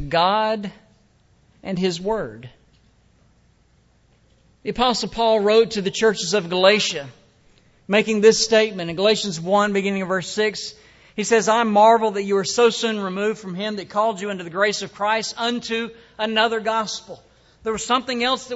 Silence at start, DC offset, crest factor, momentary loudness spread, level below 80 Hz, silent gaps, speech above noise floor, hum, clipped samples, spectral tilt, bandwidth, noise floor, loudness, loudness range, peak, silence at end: 0 s; under 0.1%; 20 dB; 13 LU; -54 dBFS; none; 38 dB; none; under 0.1%; -3.5 dB/octave; 8 kHz; -58 dBFS; -20 LUFS; 9 LU; -2 dBFS; 0 s